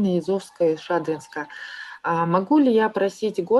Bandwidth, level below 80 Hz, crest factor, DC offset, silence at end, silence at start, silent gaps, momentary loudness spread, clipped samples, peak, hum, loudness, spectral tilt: 12 kHz; -68 dBFS; 14 dB; under 0.1%; 0 s; 0 s; none; 15 LU; under 0.1%; -6 dBFS; none; -22 LUFS; -7 dB/octave